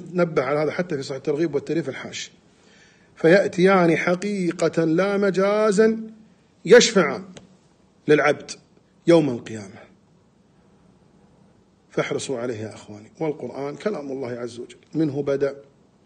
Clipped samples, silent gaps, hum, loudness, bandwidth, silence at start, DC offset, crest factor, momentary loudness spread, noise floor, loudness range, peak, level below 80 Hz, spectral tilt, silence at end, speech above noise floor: under 0.1%; none; none; -21 LUFS; 9.8 kHz; 0 s; under 0.1%; 20 dB; 18 LU; -57 dBFS; 12 LU; -4 dBFS; -66 dBFS; -5 dB/octave; 0.45 s; 37 dB